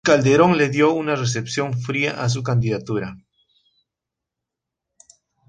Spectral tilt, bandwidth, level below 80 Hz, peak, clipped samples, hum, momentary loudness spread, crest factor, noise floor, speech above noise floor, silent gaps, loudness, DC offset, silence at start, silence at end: -5.5 dB/octave; 9.6 kHz; -56 dBFS; -2 dBFS; under 0.1%; none; 10 LU; 18 dB; -85 dBFS; 66 dB; none; -19 LUFS; under 0.1%; 0.05 s; 2.3 s